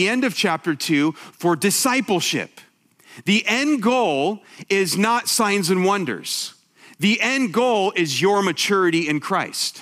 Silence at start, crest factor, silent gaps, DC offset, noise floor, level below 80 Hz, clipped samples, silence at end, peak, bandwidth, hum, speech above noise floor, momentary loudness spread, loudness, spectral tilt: 0 s; 16 dB; none; under 0.1%; -51 dBFS; -74 dBFS; under 0.1%; 0 s; -4 dBFS; 16 kHz; none; 31 dB; 7 LU; -20 LUFS; -3.5 dB/octave